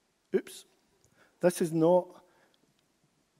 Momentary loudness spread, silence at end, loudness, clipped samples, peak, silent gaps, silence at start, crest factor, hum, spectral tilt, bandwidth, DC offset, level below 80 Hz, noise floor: 23 LU; 1.35 s; -29 LUFS; under 0.1%; -12 dBFS; none; 0.35 s; 20 dB; none; -6.5 dB/octave; 16 kHz; under 0.1%; -82 dBFS; -72 dBFS